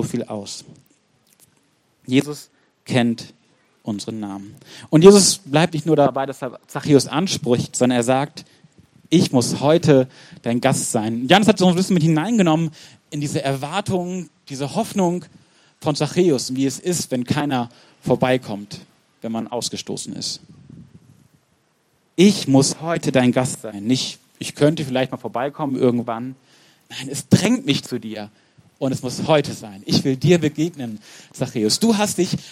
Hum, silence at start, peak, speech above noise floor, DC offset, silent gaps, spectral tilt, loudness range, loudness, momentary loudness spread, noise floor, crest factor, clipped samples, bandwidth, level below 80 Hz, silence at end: none; 0 s; 0 dBFS; 44 dB; under 0.1%; none; -5 dB/octave; 8 LU; -19 LUFS; 16 LU; -63 dBFS; 20 dB; under 0.1%; 16 kHz; -60 dBFS; 0 s